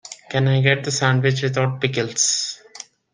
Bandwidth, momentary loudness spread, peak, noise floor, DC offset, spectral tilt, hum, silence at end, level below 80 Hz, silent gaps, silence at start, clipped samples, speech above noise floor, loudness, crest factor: 10 kHz; 13 LU; 0 dBFS; -42 dBFS; under 0.1%; -4 dB/octave; none; 0.3 s; -58 dBFS; none; 0.05 s; under 0.1%; 23 dB; -19 LUFS; 20 dB